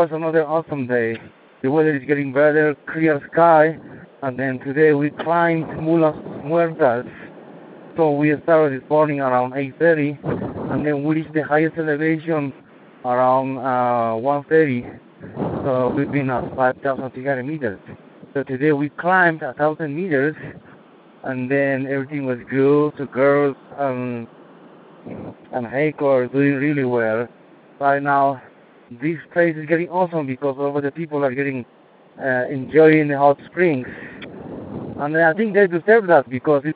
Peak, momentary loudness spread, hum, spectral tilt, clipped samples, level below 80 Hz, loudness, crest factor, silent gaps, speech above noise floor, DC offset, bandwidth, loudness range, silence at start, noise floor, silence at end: 0 dBFS; 14 LU; none; -12 dB/octave; under 0.1%; -60 dBFS; -19 LUFS; 18 dB; none; 28 dB; under 0.1%; 4.7 kHz; 4 LU; 0 s; -47 dBFS; 0 s